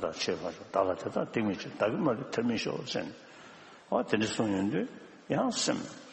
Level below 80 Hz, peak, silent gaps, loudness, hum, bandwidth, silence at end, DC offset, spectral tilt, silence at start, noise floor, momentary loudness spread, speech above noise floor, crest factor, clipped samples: -68 dBFS; -12 dBFS; none; -32 LUFS; none; 8.4 kHz; 0 s; under 0.1%; -4.5 dB/octave; 0 s; -52 dBFS; 16 LU; 21 dB; 20 dB; under 0.1%